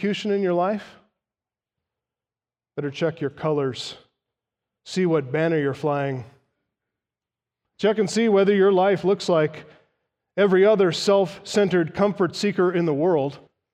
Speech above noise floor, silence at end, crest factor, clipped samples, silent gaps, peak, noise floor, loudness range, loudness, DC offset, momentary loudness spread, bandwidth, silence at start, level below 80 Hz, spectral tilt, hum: over 69 dB; 0.35 s; 16 dB; under 0.1%; none; -6 dBFS; under -90 dBFS; 10 LU; -22 LUFS; under 0.1%; 13 LU; 10.5 kHz; 0 s; -68 dBFS; -6 dB/octave; none